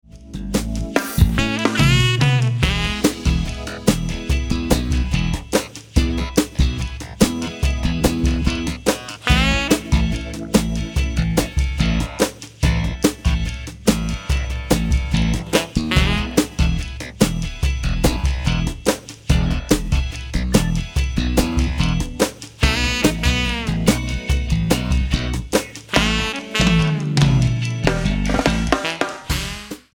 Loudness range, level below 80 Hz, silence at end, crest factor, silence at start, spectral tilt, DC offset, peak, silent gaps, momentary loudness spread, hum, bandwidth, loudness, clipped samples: 3 LU; -24 dBFS; 0.15 s; 18 dB; 0.15 s; -5 dB/octave; under 0.1%; 0 dBFS; none; 6 LU; none; 19.5 kHz; -20 LUFS; under 0.1%